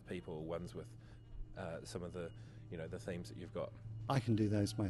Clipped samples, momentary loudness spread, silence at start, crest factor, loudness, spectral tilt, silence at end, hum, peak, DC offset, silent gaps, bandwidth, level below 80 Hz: under 0.1%; 19 LU; 0 s; 20 dB; -43 LUFS; -7 dB/octave; 0 s; none; -22 dBFS; under 0.1%; none; 12.5 kHz; -58 dBFS